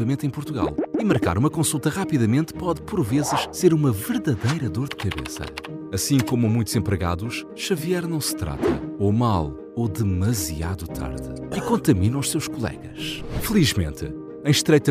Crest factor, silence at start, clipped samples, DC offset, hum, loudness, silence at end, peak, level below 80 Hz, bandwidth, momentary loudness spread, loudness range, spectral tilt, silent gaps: 18 dB; 0 s; under 0.1%; under 0.1%; none; -23 LUFS; 0 s; -4 dBFS; -42 dBFS; 16 kHz; 10 LU; 3 LU; -5.5 dB/octave; none